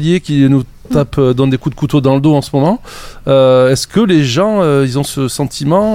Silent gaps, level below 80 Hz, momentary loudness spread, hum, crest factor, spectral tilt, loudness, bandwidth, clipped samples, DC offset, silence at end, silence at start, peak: none; -36 dBFS; 7 LU; none; 12 dB; -6.5 dB/octave; -12 LUFS; 16 kHz; under 0.1%; under 0.1%; 0 s; 0 s; 0 dBFS